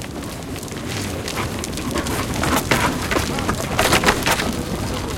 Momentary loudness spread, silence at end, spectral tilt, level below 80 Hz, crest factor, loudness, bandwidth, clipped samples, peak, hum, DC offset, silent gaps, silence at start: 12 LU; 0 s; -3.5 dB/octave; -34 dBFS; 20 dB; -21 LUFS; 17 kHz; under 0.1%; -2 dBFS; none; under 0.1%; none; 0 s